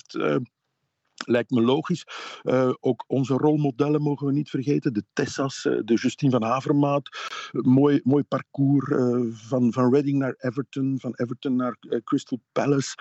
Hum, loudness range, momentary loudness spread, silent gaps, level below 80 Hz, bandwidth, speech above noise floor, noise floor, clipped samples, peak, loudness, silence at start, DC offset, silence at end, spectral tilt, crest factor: none; 3 LU; 9 LU; none; -74 dBFS; 8.2 kHz; 54 dB; -78 dBFS; under 0.1%; -10 dBFS; -24 LUFS; 0.1 s; under 0.1%; 0.05 s; -7 dB/octave; 14 dB